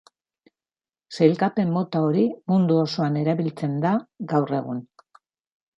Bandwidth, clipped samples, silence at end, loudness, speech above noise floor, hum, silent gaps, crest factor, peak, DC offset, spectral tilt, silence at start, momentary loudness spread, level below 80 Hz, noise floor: 7.8 kHz; under 0.1%; 0.95 s; -23 LUFS; over 68 dB; none; none; 20 dB; -4 dBFS; under 0.1%; -8 dB/octave; 1.1 s; 7 LU; -68 dBFS; under -90 dBFS